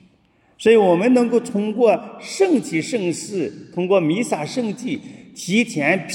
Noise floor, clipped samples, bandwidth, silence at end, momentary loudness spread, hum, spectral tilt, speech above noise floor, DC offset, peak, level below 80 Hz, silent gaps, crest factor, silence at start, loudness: -58 dBFS; under 0.1%; 16.5 kHz; 0 s; 12 LU; none; -5 dB/octave; 40 dB; under 0.1%; -2 dBFS; -68 dBFS; none; 18 dB; 0.6 s; -19 LUFS